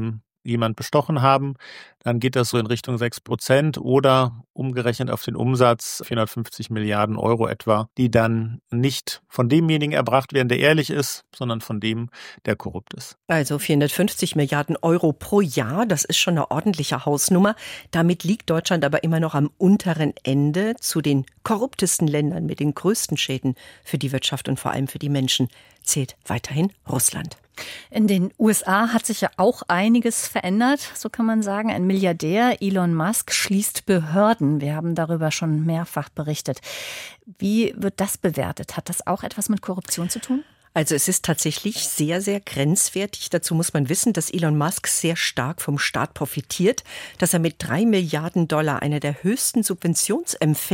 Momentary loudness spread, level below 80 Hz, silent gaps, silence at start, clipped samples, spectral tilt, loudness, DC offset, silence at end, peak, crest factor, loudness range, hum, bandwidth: 9 LU; -56 dBFS; 4.50-4.54 s; 0 s; under 0.1%; -4.5 dB/octave; -21 LUFS; under 0.1%; 0 s; -2 dBFS; 20 dB; 4 LU; none; 17 kHz